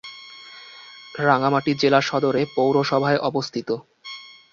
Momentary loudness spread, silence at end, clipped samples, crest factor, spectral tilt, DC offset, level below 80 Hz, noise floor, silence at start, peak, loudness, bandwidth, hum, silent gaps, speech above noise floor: 21 LU; 0.25 s; under 0.1%; 20 dB; -5.5 dB/octave; under 0.1%; -64 dBFS; -43 dBFS; 0.05 s; -2 dBFS; -21 LUFS; 7.4 kHz; none; none; 23 dB